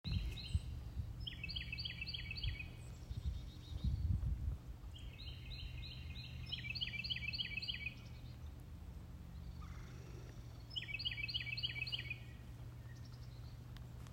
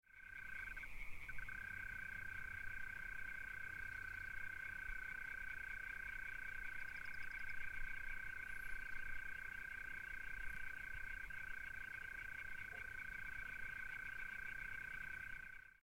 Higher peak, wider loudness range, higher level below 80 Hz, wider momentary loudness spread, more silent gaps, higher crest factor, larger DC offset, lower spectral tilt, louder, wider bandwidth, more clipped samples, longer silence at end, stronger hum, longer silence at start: first, -26 dBFS vs -34 dBFS; about the same, 3 LU vs 1 LU; first, -50 dBFS vs -58 dBFS; first, 13 LU vs 2 LU; neither; first, 20 dB vs 14 dB; neither; first, -4.5 dB/octave vs -3 dB/octave; first, -45 LUFS vs -49 LUFS; about the same, 16 kHz vs 16 kHz; neither; about the same, 0 s vs 0.05 s; neither; about the same, 0.05 s vs 0.1 s